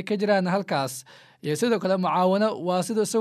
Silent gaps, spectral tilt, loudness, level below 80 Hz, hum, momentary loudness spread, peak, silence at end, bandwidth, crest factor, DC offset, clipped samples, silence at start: none; -5 dB/octave; -24 LUFS; -78 dBFS; none; 9 LU; -8 dBFS; 0 s; 15 kHz; 16 dB; under 0.1%; under 0.1%; 0 s